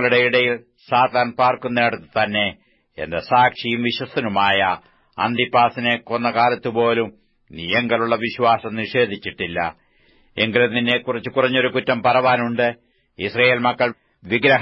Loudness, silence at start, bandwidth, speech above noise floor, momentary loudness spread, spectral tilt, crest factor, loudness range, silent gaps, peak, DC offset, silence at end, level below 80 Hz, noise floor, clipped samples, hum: -19 LUFS; 0 s; 5.8 kHz; 37 dB; 9 LU; -7.5 dB/octave; 18 dB; 2 LU; none; -2 dBFS; under 0.1%; 0 s; -56 dBFS; -56 dBFS; under 0.1%; none